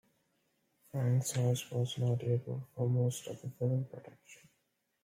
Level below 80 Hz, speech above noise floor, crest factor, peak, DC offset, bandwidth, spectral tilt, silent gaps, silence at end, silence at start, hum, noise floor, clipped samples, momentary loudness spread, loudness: -74 dBFS; 46 dB; 16 dB; -20 dBFS; under 0.1%; 16 kHz; -6 dB/octave; none; 0.7 s; 0.95 s; none; -80 dBFS; under 0.1%; 12 LU; -35 LUFS